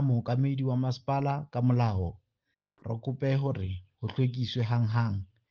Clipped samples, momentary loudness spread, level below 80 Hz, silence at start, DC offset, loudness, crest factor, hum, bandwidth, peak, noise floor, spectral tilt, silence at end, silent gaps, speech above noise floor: under 0.1%; 10 LU; -58 dBFS; 0 s; under 0.1%; -30 LUFS; 16 dB; none; 6.6 kHz; -14 dBFS; -83 dBFS; -8.5 dB/octave; 0.25 s; none; 54 dB